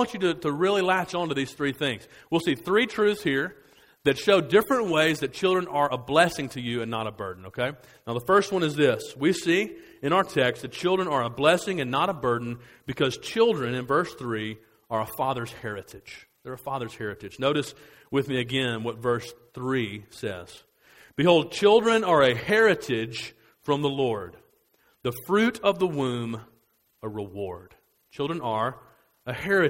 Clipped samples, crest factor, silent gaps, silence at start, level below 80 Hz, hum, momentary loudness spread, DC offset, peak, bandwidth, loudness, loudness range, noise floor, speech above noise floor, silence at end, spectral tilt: under 0.1%; 22 dB; none; 0 s; -60 dBFS; none; 15 LU; under 0.1%; -4 dBFS; 16 kHz; -25 LUFS; 8 LU; -66 dBFS; 41 dB; 0 s; -5 dB/octave